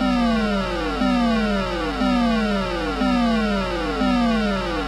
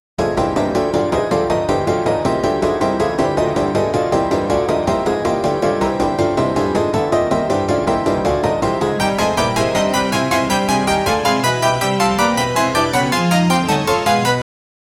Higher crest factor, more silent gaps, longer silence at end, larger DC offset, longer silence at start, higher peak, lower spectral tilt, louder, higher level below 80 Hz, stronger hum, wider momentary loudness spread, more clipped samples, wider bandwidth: about the same, 12 dB vs 14 dB; neither; second, 0 s vs 0.55 s; neither; second, 0 s vs 0.2 s; second, -8 dBFS vs -2 dBFS; about the same, -6 dB/octave vs -5 dB/octave; second, -21 LUFS vs -17 LUFS; first, -32 dBFS vs -38 dBFS; neither; about the same, 4 LU vs 2 LU; neither; second, 12 kHz vs 17.5 kHz